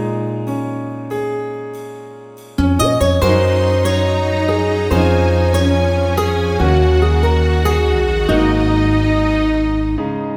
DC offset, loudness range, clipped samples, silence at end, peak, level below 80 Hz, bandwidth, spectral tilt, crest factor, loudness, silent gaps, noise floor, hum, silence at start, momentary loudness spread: under 0.1%; 3 LU; under 0.1%; 0 s; -2 dBFS; -22 dBFS; 17 kHz; -6.5 dB/octave; 14 dB; -16 LUFS; none; -36 dBFS; none; 0 s; 10 LU